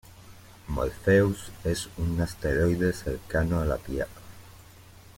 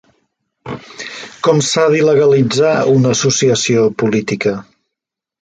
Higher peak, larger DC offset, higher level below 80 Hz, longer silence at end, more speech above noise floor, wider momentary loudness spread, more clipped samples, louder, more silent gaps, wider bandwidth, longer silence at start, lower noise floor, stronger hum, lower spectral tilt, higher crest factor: second, -10 dBFS vs 0 dBFS; neither; first, -40 dBFS vs -54 dBFS; second, 0.6 s vs 0.8 s; second, 24 dB vs 70 dB; second, 12 LU vs 16 LU; neither; second, -28 LUFS vs -13 LUFS; neither; first, 16.5 kHz vs 9.4 kHz; second, 0.1 s vs 0.65 s; second, -50 dBFS vs -83 dBFS; neither; first, -6.5 dB/octave vs -4.5 dB/octave; about the same, 18 dB vs 14 dB